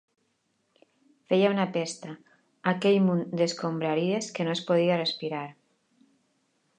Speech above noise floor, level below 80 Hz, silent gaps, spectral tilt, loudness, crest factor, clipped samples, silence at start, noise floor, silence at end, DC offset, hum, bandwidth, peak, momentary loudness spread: 48 dB; -78 dBFS; none; -5.5 dB/octave; -27 LUFS; 20 dB; under 0.1%; 1.3 s; -74 dBFS; 1.25 s; under 0.1%; none; 9.6 kHz; -8 dBFS; 13 LU